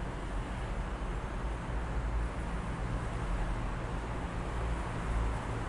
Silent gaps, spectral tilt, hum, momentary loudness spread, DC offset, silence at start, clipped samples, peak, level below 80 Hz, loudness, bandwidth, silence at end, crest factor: none; -6.5 dB/octave; none; 3 LU; under 0.1%; 0 s; under 0.1%; -22 dBFS; -36 dBFS; -38 LUFS; 11 kHz; 0 s; 12 dB